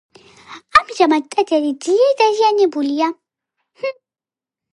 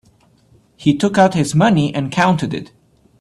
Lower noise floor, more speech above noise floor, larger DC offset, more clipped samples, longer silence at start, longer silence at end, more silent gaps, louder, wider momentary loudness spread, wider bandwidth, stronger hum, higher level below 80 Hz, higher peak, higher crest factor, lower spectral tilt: first, under -90 dBFS vs -53 dBFS; first, over 75 dB vs 38 dB; neither; neither; second, 0.5 s vs 0.8 s; first, 0.85 s vs 0.55 s; neither; about the same, -16 LUFS vs -16 LUFS; first, 13 LU vs 7 LU; about the same, 11.5 kHz vs 12.5 kHz; neither; second, -58 dBFS vs -50 dBFS; about the same, 0 dBFS vs 0 dBFS; about the same, 18 dB vs 16 dB; second, -2.5 dB/octave vs -6 dB/octave